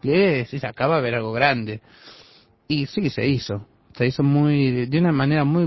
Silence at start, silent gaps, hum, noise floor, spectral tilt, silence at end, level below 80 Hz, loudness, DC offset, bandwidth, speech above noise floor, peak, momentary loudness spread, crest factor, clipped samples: 0.05 s; none; none; -52 dBFS; -8 dB/octave; 0 s; -52 dBFS; -21 LUFS; under 0.1%; 6 kHz; 32 dB; -4 dBFS; 9 LU; 18 dB; under 0.1%